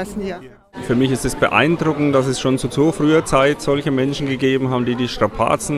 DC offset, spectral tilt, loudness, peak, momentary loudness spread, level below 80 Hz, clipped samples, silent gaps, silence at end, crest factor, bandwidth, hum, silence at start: under 0.1%; -5.5 dB/octave; -17 LUFS; 0 dBFS; 10 LU; -40 dBFS; under 0.1%; none; 0 s; 18 dB; 15 kHz; none; 0 s